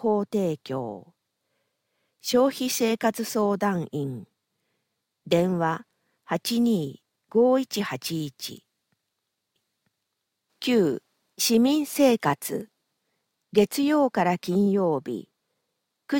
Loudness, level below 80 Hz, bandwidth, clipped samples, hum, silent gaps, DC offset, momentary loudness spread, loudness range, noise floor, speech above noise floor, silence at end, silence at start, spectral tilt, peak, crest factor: -25 LUFS; -68 dBFS; 17 kHz; under 0.1%; none; none; under 0.1%; 14 LU; 5 LU; -81 dBFS; 57 dB; 0 s; 0 s; -5 dB/octave; -6 dBFS; 20 dB